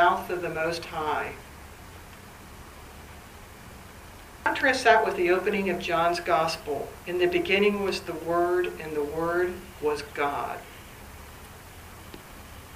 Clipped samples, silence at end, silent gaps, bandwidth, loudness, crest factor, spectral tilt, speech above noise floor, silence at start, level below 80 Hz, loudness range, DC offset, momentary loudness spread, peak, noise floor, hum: under 0.1%; 0 s; none; 15.5 kHz; -26 LUFS; 24 dB; -4.5 dB/octave; 20 dB; 0 s; -52 dBFS; 11 LU; under 0.1%; 23 LU; -4 dBFS; -46 dBFS; none